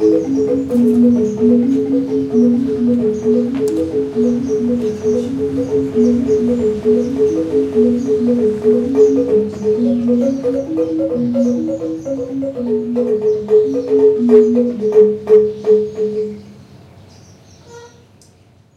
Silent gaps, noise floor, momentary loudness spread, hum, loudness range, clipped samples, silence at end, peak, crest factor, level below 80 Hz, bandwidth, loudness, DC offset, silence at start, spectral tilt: none; -48 dBFS; 7 LU; none; 4 LU; under 0.1%; 0.9 s; 0 dBFS; 14 dB; -48 dBFS; 8.8 kHz; -15 LUFS; under 0.1%; 0 s; -8 dB/octave